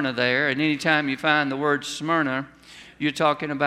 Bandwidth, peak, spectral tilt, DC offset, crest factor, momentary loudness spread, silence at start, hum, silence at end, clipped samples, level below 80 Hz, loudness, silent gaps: 14 kHz; -4 dBFS; -4.5 dB/octave; under 0.1%; 20 dB; 7 LU; 0 s; none; 0 s; under 0.1%; -64 dBFS; -23 LUFS; none